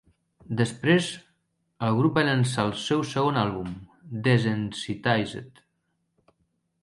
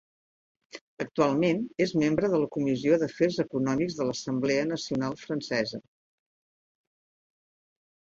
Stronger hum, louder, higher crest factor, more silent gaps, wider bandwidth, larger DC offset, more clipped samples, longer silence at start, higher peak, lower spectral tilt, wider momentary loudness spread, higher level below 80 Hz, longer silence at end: neither; first, -25 LUFS vs -28 LUFS; about the same, 20 dB vs 20 dB; second, none vs 0.81-0.97 s; first, 11.5 kHz vs 7.8 kHz; neither; neither; second, 0.5 s vs 0.75 s; about the same, -8 dBFS vs -10 dBFS; about the same, -6 dB/octave vs -6 dB/octave; first, 13 LU vs 10 LU; first, -58 dBFS vs -64 dBFS; second, 1.35 s vs 2.2 s